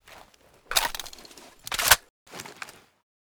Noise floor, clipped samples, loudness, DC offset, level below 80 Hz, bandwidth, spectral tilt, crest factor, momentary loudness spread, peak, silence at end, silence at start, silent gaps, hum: -56 dBFS; under 0.1%; -24 LUFS; under 0.1%; -50 dBFS; over 20 kHz; 0.5 dB/octave; 30 dB; 25 LU; -2 dBFS; 0.55 s; 0.15 s; 2.10-2.26 s; none